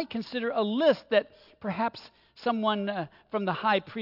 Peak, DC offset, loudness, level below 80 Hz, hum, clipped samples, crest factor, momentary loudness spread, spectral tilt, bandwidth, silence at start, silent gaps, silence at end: -12 dBFS; under 0.1%; -29 LUFS; -72 dBFS; none; under 0.1%; 16 dB; 11 LU; -7 dB/octave; 5.8 kHz; 0 s; none; 0 s